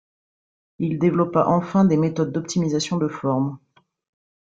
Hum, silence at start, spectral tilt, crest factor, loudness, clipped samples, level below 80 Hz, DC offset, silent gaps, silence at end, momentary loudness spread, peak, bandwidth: none; 0.8 s; -7 dB/octave; 18 dB; -21 LUFS; under 0.1%; -60 dBFS; under 0.1%; none; 0.85 s; 7 LU; -4 dBFS; 9 kHz